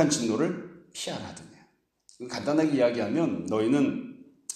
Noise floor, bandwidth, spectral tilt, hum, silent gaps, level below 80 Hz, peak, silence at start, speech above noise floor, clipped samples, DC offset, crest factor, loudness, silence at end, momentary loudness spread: -63 dBFS; 13.5 kHz; -5 dB/octave; none; none; -68 dBFS; -8 dBFS; 0 s; 37 dB; under 0.1%; under 0.1%; 20 dB; -27 LUFS; 0 s; 18 LU